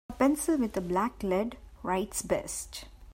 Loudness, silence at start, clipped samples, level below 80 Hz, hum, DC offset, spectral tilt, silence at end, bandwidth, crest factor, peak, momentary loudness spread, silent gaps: -31 LUFS; 0.1 s; under 0.1%; -50 dBFS; none; under 0.1%; -4.5 dB/octave; 0 s; 16 kHz; 18 dB; -14 dBFS; 11 LU; none